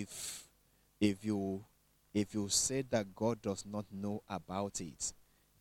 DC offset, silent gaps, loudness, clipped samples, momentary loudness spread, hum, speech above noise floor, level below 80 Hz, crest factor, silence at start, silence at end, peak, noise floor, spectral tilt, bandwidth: under 0.1%; none; -37 LUFS; under 0.1%; 11 LU; none; 34 dB; -66 dBFS; 22 dB; 0 s; 0.5 s; -16 dBFS; -71 dBFS; -4 dB/octave; 16.5 kHz